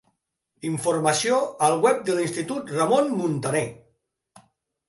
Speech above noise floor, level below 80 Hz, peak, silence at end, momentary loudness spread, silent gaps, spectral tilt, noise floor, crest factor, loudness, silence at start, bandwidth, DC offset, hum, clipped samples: 53 dB; -68 dBFS; -4 dBFS; 1.15 s; 9 LU; none; -4.5 dB/octave; -75 dBFS; 20 dB; -23 LUFS; 0.65 s; 12 kHz; under 0.1%; none; under 0.1%